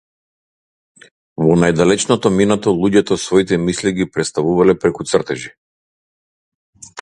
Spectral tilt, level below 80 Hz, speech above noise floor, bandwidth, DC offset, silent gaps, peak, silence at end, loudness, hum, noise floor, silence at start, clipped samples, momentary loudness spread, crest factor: -5.5 dB/octave; -46 dBFS; over 75 dB; 11 kHz; under 0.1%; 5.58-6.73 s; 0 dBFS; 0 s; -15 LUFS; none; under -90 dBFS; 1.4 s; under 0.1%; 9 LU; 16 dB